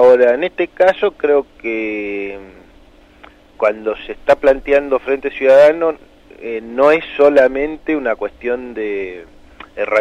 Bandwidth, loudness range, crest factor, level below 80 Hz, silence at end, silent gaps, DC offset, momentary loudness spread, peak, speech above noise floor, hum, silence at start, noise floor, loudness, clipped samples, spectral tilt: 8.2 kHz; 6 LU; 14 dB; -44 dBFS; 0 s; none; under 0.1%; 15 LU; -2 dBFS; 30 dB; 50 Hz at -55 dBFS; 0 s; -45 dBFS; -15 LUFS; under 0.1%; -5.5 dB/octave